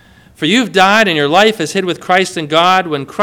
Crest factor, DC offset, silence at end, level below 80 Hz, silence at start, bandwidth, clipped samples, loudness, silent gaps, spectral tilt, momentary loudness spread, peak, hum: 12 dB; under 0.1%; 0 s; -54 dBFS; 0.4 s; over 20 kHz; 0.3%; -12 LUFS; none; -4 dB/octave; 8 LU; 0 dBFS; none